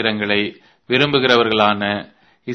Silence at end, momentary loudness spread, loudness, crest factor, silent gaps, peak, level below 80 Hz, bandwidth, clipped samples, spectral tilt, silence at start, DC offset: 0 s; 12 LU; -17 LUFS; 18 dB; none; 0 dBFS; -56 dBFS; 6.6 kHz; under 0.1%; -5.5 dB/octave; 0 s; under 0.1%